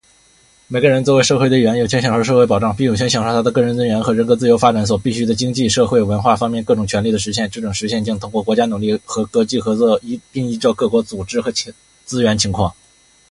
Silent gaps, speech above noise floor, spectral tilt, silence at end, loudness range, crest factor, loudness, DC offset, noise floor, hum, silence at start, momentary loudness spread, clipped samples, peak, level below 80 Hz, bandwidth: none; 36 dB; -5 dB/octave; 0.6 s; 4 LU; 16 dB; -16 LUFS; under 0.1%; -52 dBFS; none; 0.7 s; 8 LU; under 0.1%; 0 dBFS; -42 dBFS; 11.5 kHz